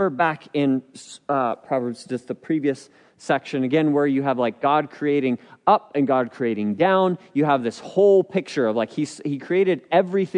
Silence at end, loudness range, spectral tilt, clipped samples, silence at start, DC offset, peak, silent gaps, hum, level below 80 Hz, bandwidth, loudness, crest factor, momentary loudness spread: 0 s; 5 LU; -6.5 dB/octave; under 0.1%; 0 s; under 0.1%; -2 dBFS; none; none; -74 dBFS; 10.5 kHz; -22 LUFS; 18 dB; 8 LU